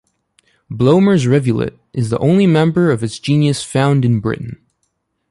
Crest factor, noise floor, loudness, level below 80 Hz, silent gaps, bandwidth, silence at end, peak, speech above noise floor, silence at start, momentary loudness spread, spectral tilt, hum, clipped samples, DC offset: 14 dB; -68 dBFS; -15 LUFS; -48 dBFS; none; 11.5 kHz; 0.75 s; -2 dBFS; 55 dB; 0.7 s; 11 LU; -7 dB/octave; none; under 0.1%; under 0.1%